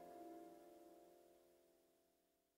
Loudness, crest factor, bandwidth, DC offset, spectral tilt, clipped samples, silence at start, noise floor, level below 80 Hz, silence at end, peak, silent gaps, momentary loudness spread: -62 LUFS; 16 dB; 16 kHz; under 0.1%; -5 dB/octave; under 0.1%; 0 s; -83 dBFS; under -90 dBFS; 0.05 s; -48 dBFS; none; 9 LU